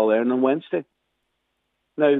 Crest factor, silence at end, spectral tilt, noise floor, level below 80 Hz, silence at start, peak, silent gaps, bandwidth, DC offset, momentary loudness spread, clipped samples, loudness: 16 dB; 0 s; -9 dB/octave; -75 dBFS; -82 dBFS; 0 s; -6 dBFS; none; 4 kHz; under 0.1%; 11 LU; under 0.1%; -22 LUFS